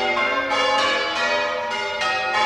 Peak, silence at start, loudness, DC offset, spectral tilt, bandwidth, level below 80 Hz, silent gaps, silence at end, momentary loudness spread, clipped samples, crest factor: -8 dBFS; 0 s; -20 LUFS; under 0.1%; -1.5 dB/octave; 15.5 kHz; -58 dBFS; none; 0 s; 5 LU; under 0.1%; 14 dB